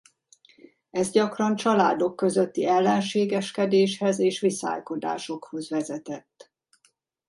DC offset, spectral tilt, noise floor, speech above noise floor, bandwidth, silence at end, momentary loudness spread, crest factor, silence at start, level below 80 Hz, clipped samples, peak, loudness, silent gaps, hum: under 0.1%; -5 dB/octave; -67 dBFS; 43 dB; 11.5 kHz; 1.1 s; 12 LU; 18 dB; 0.95 s; -72 dBFS; under 0.1%; -8 dBFS; -25 LUFS; none; none